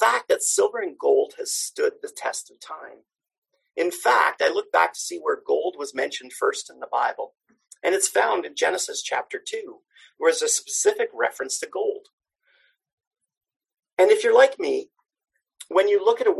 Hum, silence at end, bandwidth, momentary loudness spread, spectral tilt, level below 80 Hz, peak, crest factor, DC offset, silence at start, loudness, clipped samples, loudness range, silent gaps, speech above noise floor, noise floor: none; 0 s; 13 kHz; 14 LU; 0 dB/octave; -78 dBFS; -4 dBFS; 20 dB; under 0.1%; 0 s; -23 LUFS; under 0.1%; 3 LU; 3.38-3.42 s, 12.13-12.18 s, 12.93-12.98 s, 13.07-13.11 s, 13.56-13.60 s; 42 dB; -65 dBFS